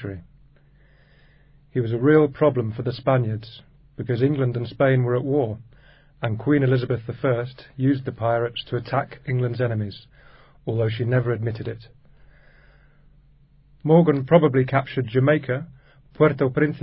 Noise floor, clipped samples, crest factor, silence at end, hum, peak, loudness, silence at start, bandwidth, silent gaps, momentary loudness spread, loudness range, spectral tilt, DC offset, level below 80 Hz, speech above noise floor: -54 dBFS; under 0.1%; 22 dB; 0 s; none; -2 dBFS; -22 LUFS; 0 s; 5.4 kHz; none; 15 LU; 6 LU; -12.5 dB/octave; under 0.1%; -54 dBFS; 33 dB